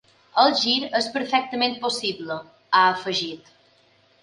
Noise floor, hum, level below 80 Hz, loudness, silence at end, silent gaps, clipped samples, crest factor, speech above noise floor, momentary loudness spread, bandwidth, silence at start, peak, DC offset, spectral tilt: -59 dBFS; none; -72 dBFS; -22 LUFS; 0.85 s; none; under 0.1%; 20 dB; 37 dB; 14 LU; 11.5 kHz; 0.35 s; -4 dBFS; under 0.1%; -2.5 dB/octave